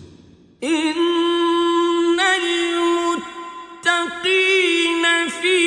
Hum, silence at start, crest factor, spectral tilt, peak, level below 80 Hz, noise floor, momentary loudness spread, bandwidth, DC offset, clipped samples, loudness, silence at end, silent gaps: none; 0 s; 16 dB; -1.5 dB/octave; -4 dBFS; -62 dBFS; -48 dBFS; 8 LU; 10 kHz; under 0.1%; under 0.1%; -18 LUFS; 0 s; none